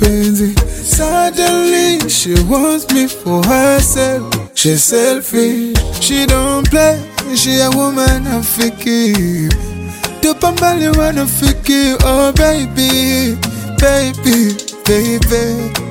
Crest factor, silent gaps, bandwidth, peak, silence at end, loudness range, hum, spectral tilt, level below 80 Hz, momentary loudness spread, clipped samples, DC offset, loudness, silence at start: 12 dB; none; 17 kHz; 0 dBFS; 0 s; 2 LU; none; -4 dB/octave; -22 dBFS; 6 LU; under 0.1%; under 0.1%; -12 LUFS; 0 s